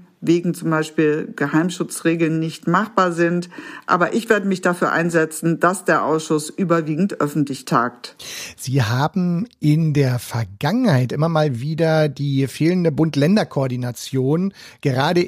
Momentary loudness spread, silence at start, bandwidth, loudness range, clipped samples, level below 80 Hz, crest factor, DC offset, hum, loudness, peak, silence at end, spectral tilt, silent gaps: 6 LU; 0.2 s; 15.5 kHz; 2 LU; under 0.1%; -60 dBFS; 18 dB; under 0.1%; none; -19 LUFS; -2 dBFS; 0 s; -6 dB/octave; none